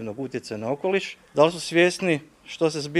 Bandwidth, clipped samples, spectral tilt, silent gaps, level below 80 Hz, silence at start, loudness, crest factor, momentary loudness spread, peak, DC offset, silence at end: 13 kHz; under 0.1%; -5 dB/octave; none; -66 dBFS; 0 s; -24 LUFS; 20 dB; 11 LU; -4 dBFS; under 0.1%; 0 s